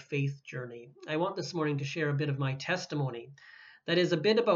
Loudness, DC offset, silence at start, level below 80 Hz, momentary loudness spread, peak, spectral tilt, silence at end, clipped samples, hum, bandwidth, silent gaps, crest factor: -32 LUFS; under 0.1%; 0 s; -82 dBFS; 18 LU; -12 dBFS; -6 dB/octave; 0 s; under 0.1%; none; 7.4 kHz; none; 18 dB